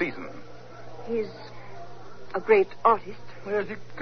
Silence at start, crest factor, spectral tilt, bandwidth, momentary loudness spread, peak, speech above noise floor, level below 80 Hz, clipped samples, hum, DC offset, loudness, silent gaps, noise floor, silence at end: 0 s; 22 dB; -6.5 dB/octave; 6.4 kHz; 23 LU; -6 dBFS; 19 dB; -58 dBFS; under 0.1%; none; 1%; -26 LUFS; none; -45 dBFS; 0 s